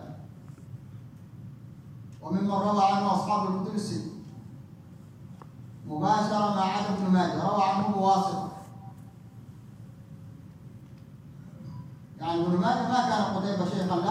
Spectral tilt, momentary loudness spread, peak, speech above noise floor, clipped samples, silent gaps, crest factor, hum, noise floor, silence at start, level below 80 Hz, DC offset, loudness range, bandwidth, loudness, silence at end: -6.5 dB/octave; 23 LU; -10 dBFS; 22 dB; under 0.1%; none; 18 dB; none; -48 dBFS; 0 s; -66 dBFS; under 0.1%; 13 LU; 11 kHz; -27 LUFS; 0 s